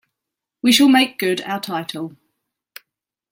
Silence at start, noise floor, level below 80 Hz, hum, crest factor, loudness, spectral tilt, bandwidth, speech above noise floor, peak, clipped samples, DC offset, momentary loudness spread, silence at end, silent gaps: 0.65 s; -84 dBFS; -66 dBFS; none; 18 dB; -17 LUFS; -3 dB/octave; 16.5 kHz; 66 dB; -2 dBFS; under 0.1%; under 0.1%; 17 LU; 1.2 s; none